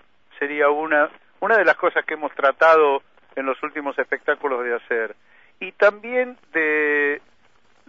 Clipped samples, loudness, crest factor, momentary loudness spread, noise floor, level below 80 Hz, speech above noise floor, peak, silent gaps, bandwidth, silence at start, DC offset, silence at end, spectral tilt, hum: under 0.1%; -20 LUFS; 18 dB; 12 LU; -60 dBFS; -72 dBFS; 40 dB; -4 dBFS; none; 7.2 kHz; 0.4 s; 0.2%; 0.7 s; -4.5 dB/octave; none